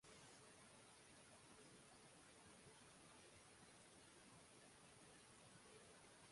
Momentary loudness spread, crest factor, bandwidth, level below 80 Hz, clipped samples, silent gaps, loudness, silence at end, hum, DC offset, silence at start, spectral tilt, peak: 1 LU; 14 dB; 11.5 kHz; -86 dBFS; under 0.1%; none; -66 LUFS; 0 s; none; under 0.1%; 0 s; -2.5 dB/octave; -52 dBFS